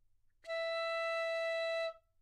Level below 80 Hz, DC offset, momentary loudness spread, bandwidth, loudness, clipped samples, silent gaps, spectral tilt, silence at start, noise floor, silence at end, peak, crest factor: -76 dBFS; under 0.1%; 7 LU; 11 kHz; -37 LUFS; under 0.1%; none; 1.5 dB/octave; 0.45 s; -57 dBFS; 0.25 s; -30 dBFS; 8 dB